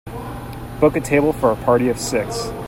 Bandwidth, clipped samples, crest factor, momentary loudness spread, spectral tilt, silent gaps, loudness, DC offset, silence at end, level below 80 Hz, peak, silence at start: 16.5 kHz; under 0.1%; 18 dB; 15 LU; -5.5 dB/octave; none; -18 LUFS; under 0.1%; 0 s; -38 dBFS; -2 dBFS; 0.05 s